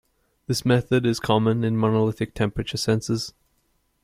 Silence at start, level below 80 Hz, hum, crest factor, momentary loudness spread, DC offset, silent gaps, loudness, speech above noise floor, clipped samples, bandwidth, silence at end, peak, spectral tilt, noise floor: 0.5 s; -48 dBFS; none; 18 dB; 8 LU; under 0.1%; none; -23 LUFS; 46 dB; under 0.1%; 15.5 kHz; 0.75 s; -4 dBFS; -6 dB/octave; -68 dBFS